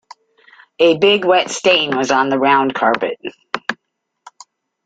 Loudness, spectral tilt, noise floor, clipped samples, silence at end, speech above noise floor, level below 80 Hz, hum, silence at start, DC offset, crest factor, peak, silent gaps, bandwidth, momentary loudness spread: -15 LUFS; -3.5 dB/octave; -74 dBFS; under 0.1%; 1.1 s; 60 dB; -62 dBFS; none; 0.8 s; under 0.1%; 16 dB; 0 dBFS; none; 9.2 kHz; 13 LU